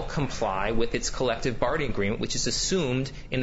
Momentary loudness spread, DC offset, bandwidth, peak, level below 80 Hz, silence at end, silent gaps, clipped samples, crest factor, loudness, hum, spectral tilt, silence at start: 3 LU; under 0.1%; 8 kHz; -10 dBFS; -38 dBFS; 0 s; none; under 0.1%; 16 dB; -27 LUFS; none; -4 dB/octave; 0 s